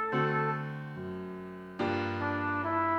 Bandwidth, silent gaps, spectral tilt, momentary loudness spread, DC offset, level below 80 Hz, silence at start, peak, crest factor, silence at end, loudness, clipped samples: 8 kHz; none; -8 dB/octave; 12 LU; under 0.1%; -68 dBFS; 0 s; -18 dBFS; 14 dB; 0 s; -33 LUFS; under 0.1%